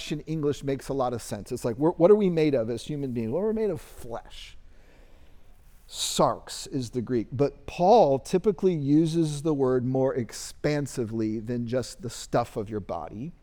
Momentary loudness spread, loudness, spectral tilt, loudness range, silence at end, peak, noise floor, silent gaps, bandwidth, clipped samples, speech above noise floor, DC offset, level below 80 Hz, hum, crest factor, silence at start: 15 LU; -26 LUFS; -6 dB/octave; 8 LU; 0.1 s; -8 dBFS; -50 dBFS; none; 20 kHz; under 0.1%; 24 dB; under 0.1%; -50 dBFS; none; 20 dB; 0 s